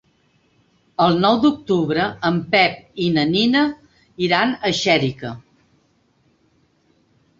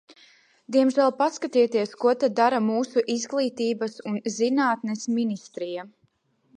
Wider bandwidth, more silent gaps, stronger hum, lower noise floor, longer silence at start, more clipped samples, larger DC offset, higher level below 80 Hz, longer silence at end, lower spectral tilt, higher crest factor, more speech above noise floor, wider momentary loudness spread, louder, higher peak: second, 7.8 kHz vs 10.5 kHz; neither; neither; second, -61 dBFS vs -67 dBFS; first, 1 s vs 0.1 s; neither; neither; first, -56 dBFS vs -80 dBFS; first, 2 s vs 0.7 s; about the same, -5.5 dB/octave vs -4.5 dB/octave; about the same, 18 dB vs 18 dB; about the same, 43 dB vs 43 dB; first, 12 LU vs 9 LU; first, -18 LUFS vs -24 LUFS; first, -2 dBFS vs -6 dBFS